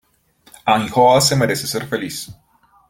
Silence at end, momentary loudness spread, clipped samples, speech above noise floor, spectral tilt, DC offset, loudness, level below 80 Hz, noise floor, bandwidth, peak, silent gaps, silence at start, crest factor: 0.6 s; 16 LU; under 0.1%; 38 dB; -4 dB/octave; under 0.1%; -16 LUFS; -52 dBFS; -55 dBFS; 17 kHz; -2 dBFS; none; 0.65 s; 16 dB